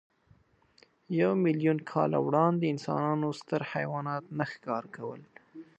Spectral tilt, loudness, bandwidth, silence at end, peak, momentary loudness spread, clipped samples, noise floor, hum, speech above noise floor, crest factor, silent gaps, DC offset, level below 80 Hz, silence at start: -8 dB/octave; -30 LUFS; 8.6 kHz; 0.15 s; -12 dBFS; 13 LU; under 0.1%; -65 dBFS; none; 36 dB; 20 dB; none; under 0.1%; -74 dBFS; 1.1 s